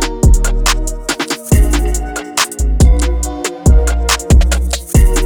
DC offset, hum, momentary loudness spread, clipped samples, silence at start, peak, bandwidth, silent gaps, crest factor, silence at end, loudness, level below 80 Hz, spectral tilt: under 0.1%; none; 7 LU; under 0.1%; 0 s; -2 dBFS; 19.5 kHz; none; 10 dB; 0 s; -14 LUFS; -12 dBFS; -4.5 dB/octave